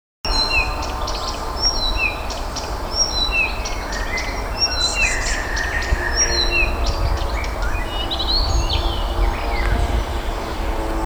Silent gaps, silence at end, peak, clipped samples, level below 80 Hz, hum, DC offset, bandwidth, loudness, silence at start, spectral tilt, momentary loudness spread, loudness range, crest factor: none; 0 s; -6 dBFS; under 0.1%; -24 dBFS; none; 0.3%; over 20 kHz; -20 LUFS; 0.25 s; -3 dB/octave; 9 LU; 3 LU; 16 dB